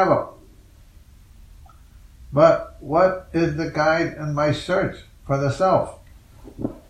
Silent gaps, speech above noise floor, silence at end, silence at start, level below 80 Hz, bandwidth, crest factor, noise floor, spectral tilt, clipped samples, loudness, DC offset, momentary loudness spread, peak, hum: none; 28 dB; 0.1 s; 0 s; -46 dBFS; 12 kHz; 20 dB; -48 dBFS; -7 dB/octave; under 0.1%; -21 LUFS; under 0.1%; 14 LU; -2 dBFS; none